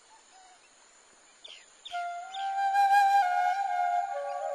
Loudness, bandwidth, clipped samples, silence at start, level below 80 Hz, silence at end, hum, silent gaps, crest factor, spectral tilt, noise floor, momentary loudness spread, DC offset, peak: -28 LUFS; 13 kHz; under 0.1%; 1.45 s; -82 dBFS; 0 s; none; none; 16 dB; 1.5 dB/octave; -59 dBFS; 24 LU; under 0.1%; -14 dBFS